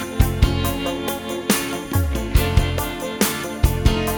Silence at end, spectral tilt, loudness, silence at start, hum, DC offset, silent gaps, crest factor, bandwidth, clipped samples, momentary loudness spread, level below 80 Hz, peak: 0 s; -5 dB/octave; -21 LUFS; 0 s; none; under 0.1%; none; 20 dB; 19.5 kHz; under 0.1%; 6 LU; -24 dBFS; 0 dBFS